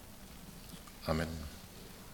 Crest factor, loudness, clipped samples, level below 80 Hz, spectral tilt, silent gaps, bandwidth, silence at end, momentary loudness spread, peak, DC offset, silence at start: 26 dB; -43 LUFS; under 0.1%; -54 dBFS; -5 dB/octave; none; 18 kHz; 0 s; 15 LU; -16 dBFS; under 0.1%; 0 s